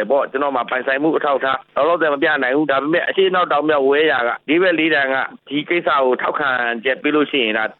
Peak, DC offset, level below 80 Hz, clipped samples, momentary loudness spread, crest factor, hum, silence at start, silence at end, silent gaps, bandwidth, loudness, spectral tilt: -4 dBFS; under 0.1%; -62 dBFS; under 0.1%; 5 LU; 12 dB; none; 0 s; 0.05 s; none; 4.3 kHz; -17 LUFS; -8 dB/octave